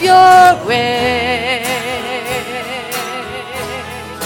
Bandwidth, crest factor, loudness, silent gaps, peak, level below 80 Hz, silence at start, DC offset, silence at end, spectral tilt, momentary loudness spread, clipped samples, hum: 18.5 kHz; 14 dB; -13 LUFS; none; 0 dBFS; -44 dBFS; 0 s; under 0.1%; 0 s; -3 dB/octave; 17 LU; under 0.1%; none